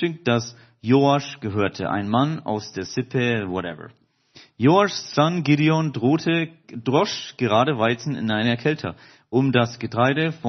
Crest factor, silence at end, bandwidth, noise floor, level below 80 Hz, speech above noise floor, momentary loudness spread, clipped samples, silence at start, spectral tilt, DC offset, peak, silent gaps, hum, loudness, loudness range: 18 dB; 0 s; 6.4 kHz; -52 dBFS; -64 dBFS; 31 dB; 10 LU; under 0.1%; 0 s; -6 dB/octave; under 0.1%; -2 dBFS; none; none; -22 LUFS; 3 LU